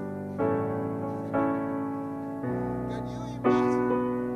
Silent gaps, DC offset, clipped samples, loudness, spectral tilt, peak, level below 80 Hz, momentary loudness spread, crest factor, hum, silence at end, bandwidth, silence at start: none; under 0.1%; under 0.1%; -29 LUFS; -8.5 dB/octave; -12 dBFS; -54 dBFS; 9 LU; 18 dB; none; 0 s; 11.5 kHz; 0 s